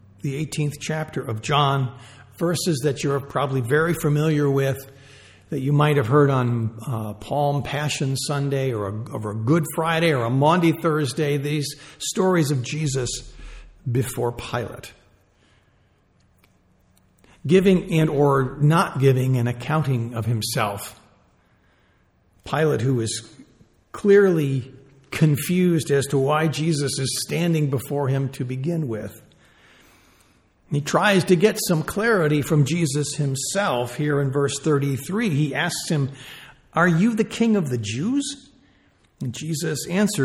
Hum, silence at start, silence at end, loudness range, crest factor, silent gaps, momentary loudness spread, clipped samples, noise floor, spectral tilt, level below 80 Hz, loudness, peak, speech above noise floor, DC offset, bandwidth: none; 0.25 s; 0 s; 7 LU; 18 dB; none; 11 LU; under 0.1%; -61 dBFS; -5.5 dB/octave; -52 dBFS; -22 LUFS; -4 dBFS; 40 dB; under 0.1%; 17 kHz